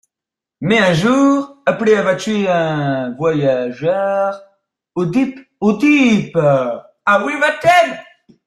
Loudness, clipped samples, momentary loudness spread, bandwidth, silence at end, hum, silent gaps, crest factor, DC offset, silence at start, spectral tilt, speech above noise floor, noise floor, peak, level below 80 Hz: -15 LUFS; under 0.1%; 9 LU; 12.5 kHz; 0.45 s; none; none; 14 dB; under 0.1%; 0.6 s; -6 dB/octave; 72 dB; -86 dBFS; -2 dBFS; -54 dBFS